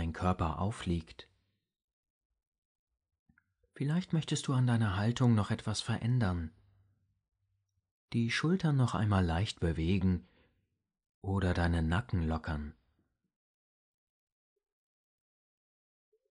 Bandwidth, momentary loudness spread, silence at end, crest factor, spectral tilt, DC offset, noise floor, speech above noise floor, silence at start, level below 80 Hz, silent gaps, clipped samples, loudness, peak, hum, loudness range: 10.5 kHz; 9 LU; 3.6 s; 18 dB; -6.5 dB/octave; under 0.1%; -81 dBFS; 50 dB; 0 s; -50 dBFS; 1.84-2.03 s, 2.10-2.30 s, 2.47-2.52 s, 2.58-2.87 s, 3.19-3.26 s, 7.91-8.08 s, 11.14-11.22 s; under 0.1%; -33 LUFS; -16 dBFS; none; 10 LU